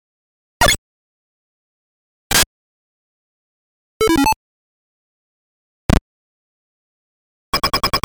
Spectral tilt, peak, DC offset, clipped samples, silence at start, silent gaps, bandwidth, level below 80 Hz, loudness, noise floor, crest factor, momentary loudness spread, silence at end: -3 dB/octave; 0 dBFS; under 0.1%; under 0.1%; 0.6 s; 0.78-2.30 s, 2.46-4.00 s, 4.36-5.89 s, 6.01-7.53 s; over 20 kHz; -32 dBFS; -17 LUFS; under -90 dBFS; 22 dB; 7 LU; 0.05 s